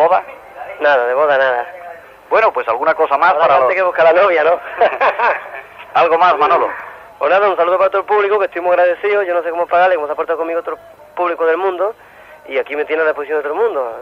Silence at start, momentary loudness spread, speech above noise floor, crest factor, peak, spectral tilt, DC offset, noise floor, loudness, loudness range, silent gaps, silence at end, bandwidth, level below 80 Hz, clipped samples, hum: 0 s; 11 LU; 21 dB; 14 dB; -2 dBFS; -5 dB/octave; under 0.1%; -34 dBFS; -14 LUFS; 5 LU; none; 0 s; 6.6 kHz; -60 dBFS; under 0.1%; none